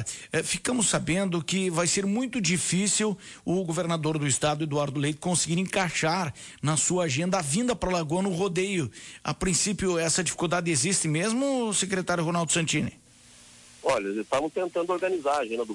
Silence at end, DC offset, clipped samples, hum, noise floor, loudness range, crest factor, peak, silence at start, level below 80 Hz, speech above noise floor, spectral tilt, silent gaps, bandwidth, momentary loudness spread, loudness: 0 s; under 0.1%; under 0.1%; none; -53 dBFS; 2 LU; 14 dB; -12 dBFS; 0 s; -54 dBFS; 27 dB; -4 dB/octave; none; 11.5 kHz; 6 LU; -26 LUFS